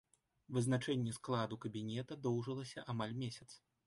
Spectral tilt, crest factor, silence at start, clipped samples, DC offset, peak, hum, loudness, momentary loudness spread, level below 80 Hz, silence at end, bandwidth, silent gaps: -6 dB/octave; 16 dB; 0.5 s; under 0.1%; under 0.1%; -24 dBFS; none; -41 LUFS; 9 LU; -74 dBFS; 0.3 s; 11.5 kHz; none